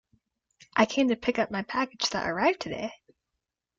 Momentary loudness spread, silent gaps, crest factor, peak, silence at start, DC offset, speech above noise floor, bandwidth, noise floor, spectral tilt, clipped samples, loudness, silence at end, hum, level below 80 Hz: 9 LU; none; 22 dB; -6 dBFS; 0.75 s; under 0.1%; 58 dB; 7.8 kHz; -85 dBFS; -4 dB/octave; under 0.1%; -27 LUFS; 0.85 s; none; -62 dBFS